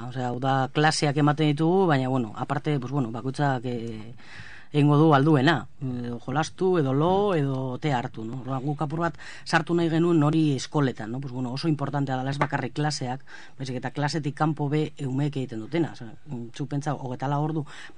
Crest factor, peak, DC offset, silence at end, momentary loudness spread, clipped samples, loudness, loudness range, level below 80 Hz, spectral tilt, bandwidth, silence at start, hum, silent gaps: 20 dB; -4 dBFS; 0.9%; 0.05 s; 13 LU; under 0.1%; -25 LUFS; 6 LU; -62 dBFS; -6.5 dB/octave; 10 kHz; 0 s; none; none